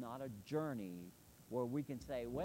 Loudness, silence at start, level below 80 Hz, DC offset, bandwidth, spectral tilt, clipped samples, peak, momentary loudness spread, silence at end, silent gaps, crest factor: -45 LUFS; 0 s; -68 dBFS; under 0.1%; 16 kHz; -7 dB/octave; under 0.1%; -28 dBFS; 12 LU; 0 s; none; 16 dB